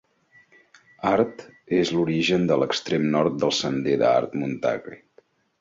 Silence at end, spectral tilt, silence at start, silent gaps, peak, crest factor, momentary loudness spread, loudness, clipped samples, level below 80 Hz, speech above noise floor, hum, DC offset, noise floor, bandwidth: 0.65 s; -5.5 dB/octave; 1 s; none; -6 dBFS; 18 dB; 8 LU; -23 LUFS; under 0.1%; -60 dBFS; 37 dB; none; under 0.1%; -59 dBFS; 7.8 kHz